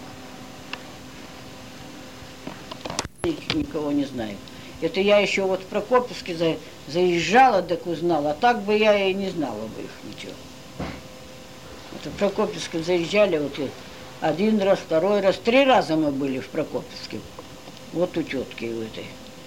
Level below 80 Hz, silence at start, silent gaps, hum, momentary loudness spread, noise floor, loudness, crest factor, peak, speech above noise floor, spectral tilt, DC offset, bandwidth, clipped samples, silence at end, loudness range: -54 dBFS; 0 s; none; none; 21 LU; -42 dBFS; -23 LUFS; 18 dB; -6 dBFS; 19 dB; -5 dB/octave; 0.3%; 16.5 kHz; under 0.1%; 0 s; 10 LU